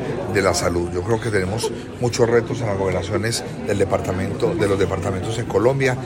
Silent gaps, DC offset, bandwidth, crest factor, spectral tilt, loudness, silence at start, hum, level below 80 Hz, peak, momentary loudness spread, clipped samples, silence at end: none; under 0.1%; 16.5 kHz; 18 dB; -5.5 dB/octave; -21 LUFS; 0 s; none; -44 dBFS; -2 dBFS; 6 LU; under 0.1%; 0 s